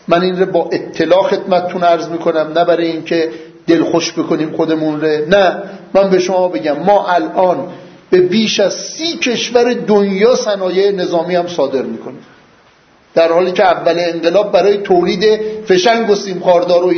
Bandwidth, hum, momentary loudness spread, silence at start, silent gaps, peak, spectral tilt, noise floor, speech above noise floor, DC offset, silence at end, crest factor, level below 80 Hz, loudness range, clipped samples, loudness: 6.6 kHz; none; 6 LU; 0.1 s; none; 0 dBFS; -5 dB/octave; -48 dBFS; 35 dB; under 0.1%; 0 s; 12 dB; -54 dBFS; 3 LU; under 0.1%; -13 LUFS